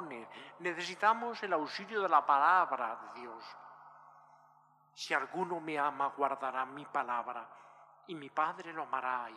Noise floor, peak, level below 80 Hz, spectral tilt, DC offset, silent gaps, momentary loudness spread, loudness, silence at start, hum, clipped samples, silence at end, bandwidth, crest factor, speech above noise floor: -66 dBFS; -14 dBFS; under -90 dBFS; -4 dB/octave; under 0.1%; none; 19 LU; -34 LUFS; 0 s; 50 Hz at -75 dBFS; under 0.1%; 0 s; 12.5 kHz; 22 dB; 32 dB